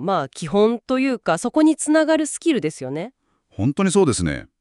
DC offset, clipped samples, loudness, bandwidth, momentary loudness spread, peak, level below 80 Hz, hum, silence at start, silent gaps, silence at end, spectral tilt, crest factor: under 0.1%; under 0.1%; -20 LUFS; 12 kHz; 9 LU; -4 dBFS; -50 dBFS; none; 0 s; none; 0.15 s; -5 dB/octave; 16 dB